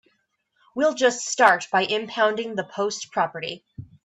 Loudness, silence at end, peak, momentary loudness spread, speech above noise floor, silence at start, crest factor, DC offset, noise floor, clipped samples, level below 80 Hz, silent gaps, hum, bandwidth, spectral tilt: -22 LUFS; 0.2 s; -2 dBFS; 14 LU; 48 dB; 0.75 s; 22 dB; under 0.1%; -71 dBFS; under 0.1%; -68 dBFS; none; none; 12 kHz; -2.5 dB/octave